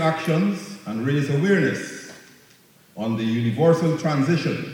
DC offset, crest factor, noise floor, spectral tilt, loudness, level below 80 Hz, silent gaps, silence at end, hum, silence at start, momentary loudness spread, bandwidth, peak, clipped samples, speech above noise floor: under 0.1%; 16 dB; -54 dBFS; -7 dB/octave; -22 LUFS; -68 dBFS; none; 0 s; none; 0 s; 13 LU; 16.5 kHz; -6 dBFS; under 0.1%; 33 dB